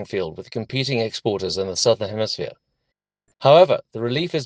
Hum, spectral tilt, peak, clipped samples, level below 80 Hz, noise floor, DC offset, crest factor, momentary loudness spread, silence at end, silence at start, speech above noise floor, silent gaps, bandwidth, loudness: none; -4.5 dB/octave; 0 dBFS; under 0.1%; -62 dBFS; -79 dBFS; under 0.1%; 20 dB; 14 LU; 0 s; 0 s; 59 dB; none; 9.8 kHz; -20 LUFS